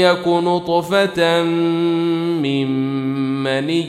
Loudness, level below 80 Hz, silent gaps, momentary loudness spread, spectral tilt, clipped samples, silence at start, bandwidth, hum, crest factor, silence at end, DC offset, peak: -18 LUFS; -58 dBFS; none; 5 LU; -6 dB/octave; under 0.1%; 0 s; 14 kHz; none; 16 dB; 0 s; under 0.1%; -2 dBFS